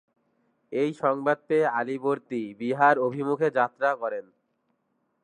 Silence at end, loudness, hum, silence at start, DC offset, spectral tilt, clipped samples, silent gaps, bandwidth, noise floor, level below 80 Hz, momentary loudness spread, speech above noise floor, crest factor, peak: 1 s; -26 LUFS; none; 0.7 s; under 0.1%; -7 dB/octave; under 0.1%; none; 10 kHz; -74 dBFS; -82 dBFS; 10 LU; 49 dB; 20 dB; -6 dBFS